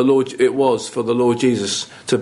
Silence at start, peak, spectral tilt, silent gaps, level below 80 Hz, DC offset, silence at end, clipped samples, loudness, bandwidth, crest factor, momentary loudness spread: 0 s; -4 dBFS; -4.5 dB/octave; none; -60 dBFS; under 0.1%; 0 s; under 0.1%; -18 LUFS; 11.5 kHz; 14 dB; 6 LU